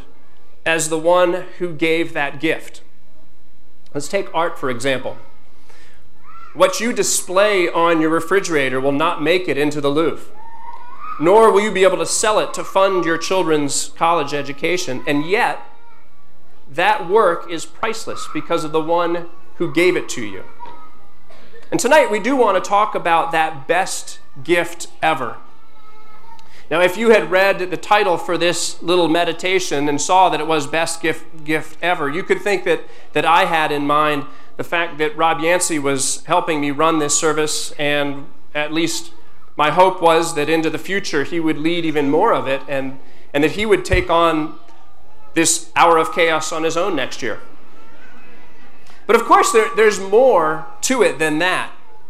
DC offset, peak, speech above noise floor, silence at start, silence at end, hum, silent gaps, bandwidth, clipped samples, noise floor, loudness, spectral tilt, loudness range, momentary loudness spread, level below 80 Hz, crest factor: 6%; -2 dBFS; 39 dB; 0.25 s; 0.3 s; none; none; 16 kHz; under 0.1%; -56 dBFS; -17 LUFS; -3.5 dB/octave; 5 LU; 12 LU; -46 dBFS; 18 dB